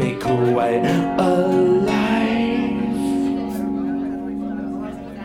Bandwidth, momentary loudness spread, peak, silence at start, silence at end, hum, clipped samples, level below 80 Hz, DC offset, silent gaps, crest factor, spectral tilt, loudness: 15.5 kHz; 10 LU; -4 dBFS; 0 s; 0 s; none; under 0.1%; -46 dBFS; under 0.1%; none; 14 dB; -7 dB/octave; -20 LUFS